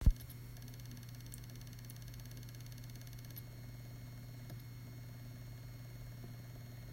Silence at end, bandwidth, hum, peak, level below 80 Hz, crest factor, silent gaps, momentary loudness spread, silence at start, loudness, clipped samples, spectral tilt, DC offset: 0 s; 16 kHz; 50 Hz at -65 dBFS; -18 dBFS; -44 dBFS; 26 dB; none; 1 LU; 0 s; -50 LUFS; under 0.1%; -5.5 dB/octave; under 0.1%